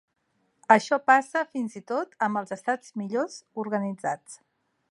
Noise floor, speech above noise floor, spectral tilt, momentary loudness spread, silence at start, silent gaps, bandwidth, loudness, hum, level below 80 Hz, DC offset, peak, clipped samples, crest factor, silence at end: -64 dBFS; 38 dB; -5 dB/octave; 13 LU; 0.7 s; none; 11.5 kHz; -26 LUFS; none; -82 dBFS; under 0.1%; -4 dBFS; under 0.1%; 24 dB; 0.55 s